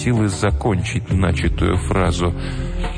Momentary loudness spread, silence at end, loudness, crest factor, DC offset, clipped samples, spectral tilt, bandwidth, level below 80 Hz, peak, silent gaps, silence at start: 6 LU; 0 s; -20 LUFS; 14 dB; under 0.1%; under 0.1%; -6 dB/octave; 10 kHz; -26 dBFS; -4 dBFS; none; 0 s